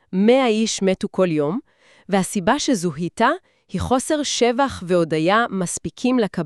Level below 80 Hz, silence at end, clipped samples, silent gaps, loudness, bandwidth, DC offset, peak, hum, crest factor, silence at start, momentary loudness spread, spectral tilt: -50 dBFS; 0 s; under 0.1%; none; -20 LUFS; 13 kHz; 0.1%; -4 dBFS; none; 16 dB; 0.1 s; 8 LU; -4.5 dB/octave